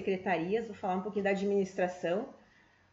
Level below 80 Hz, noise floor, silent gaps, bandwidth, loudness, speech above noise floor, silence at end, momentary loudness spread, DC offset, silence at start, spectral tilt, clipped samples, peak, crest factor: -72 dBFS; -64 dBFS; none; 7.8 kHz; -33 LUFS; 32 dB; 0.55 s; 5 LU; under 0.1%; 0 s; -6.5 dB/octave; under 0.1%; -18 dBFS; 16 dB